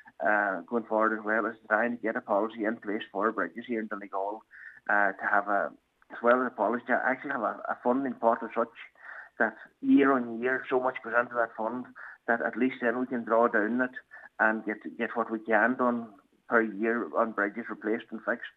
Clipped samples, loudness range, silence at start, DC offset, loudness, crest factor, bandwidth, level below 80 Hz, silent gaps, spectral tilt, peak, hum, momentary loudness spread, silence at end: under 0.1%; 2 LU; 0.05 s; under 0.1%; -29 LUFS; 20 dB; 4.1 kHz; -84 dBFS; none; -7.5 dB/octave; -8 dBFS; none; 10 LU; 0.05 s